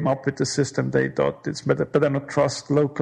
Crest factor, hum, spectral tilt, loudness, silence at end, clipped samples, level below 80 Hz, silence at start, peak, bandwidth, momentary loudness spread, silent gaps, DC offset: 18 dB; none; -5.5 dB/octave; -23 LUFS; 0 s; under 0.1%; -56 dBFS; 0 s; -4 dBFS; 10.5 kHz; 3 LU; none; under 0.1%